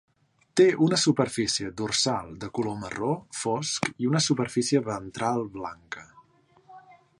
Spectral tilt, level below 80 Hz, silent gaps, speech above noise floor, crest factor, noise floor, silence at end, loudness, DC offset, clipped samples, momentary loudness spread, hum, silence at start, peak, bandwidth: -4 dB/octave; -60 dBFS; none; 34 dB; 20 dB; -60 dBFS; 0.4 s; -26 LUFS; under 0.1%; under 0.1%; 13 LU; none; 0.55 s; -8 dBFS; 11.5 kHz